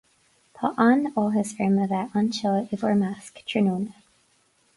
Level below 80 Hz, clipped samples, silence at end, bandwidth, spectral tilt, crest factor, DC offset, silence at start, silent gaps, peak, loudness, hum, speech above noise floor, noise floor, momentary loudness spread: -66 dBFS; under 0.1%; 0.85 s; 11.5 kHz; -6.5 dB/octave; 18 dB; under 0.1%; 0.6 s; none; -8 dBFS; -24 LUFS; none; 41 dB; -65 dBFS; 10 LU